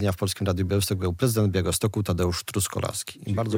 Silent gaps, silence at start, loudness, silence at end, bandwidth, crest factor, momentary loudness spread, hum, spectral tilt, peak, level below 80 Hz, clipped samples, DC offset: none; 0 s; -26 LUFS; 0 s; 17 kHz; 16 dB; 6 LU; none; -5 dB/octave; -8 dBFS; -52 dBFS; under 0.1%; under 0.1%